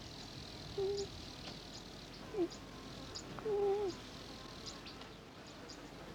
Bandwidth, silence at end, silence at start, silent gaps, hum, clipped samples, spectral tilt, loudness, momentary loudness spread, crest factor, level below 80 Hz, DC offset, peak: 19 kHz; 0 s; 0 s; none; none; under 0.1%; -4.5 dB/octave; -44 LUFS; 14 LU; 16 dB; -60 dBFS; under 0.1%; -26 dBFS